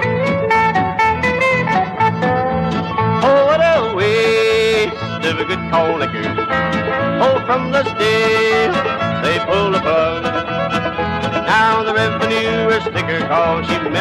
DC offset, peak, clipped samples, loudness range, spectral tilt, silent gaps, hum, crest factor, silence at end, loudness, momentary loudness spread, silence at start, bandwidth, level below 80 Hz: under 0.1%; -2 dBFS; under 0.1%; 2 LU; -5.5 dB/octave; none; none; 12 dB; 0 s; -15 LUFS; 6 LU; 0 s; 13 kHz; -42 dBFS